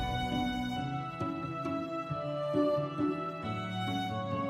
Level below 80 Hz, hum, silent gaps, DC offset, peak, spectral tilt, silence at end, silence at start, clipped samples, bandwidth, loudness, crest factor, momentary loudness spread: -52 dBFS; none; none; under 0.1%; -18 dBFS; -6.5 dB/octave; 0 s; 0 s; under 0.1%; 16 kHz; -34 LUFS; 16 dB; 6 LU